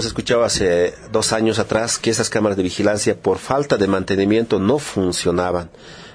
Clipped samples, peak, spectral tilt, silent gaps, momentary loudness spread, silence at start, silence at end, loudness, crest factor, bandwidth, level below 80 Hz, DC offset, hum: under 0.1%; -2 dBFS; -4 dB/octave; none; 4 LU; 0 s; 0 s; -18 LUFS; 16 dB; 11 kHz; -46 dBFS; under 0.1%; none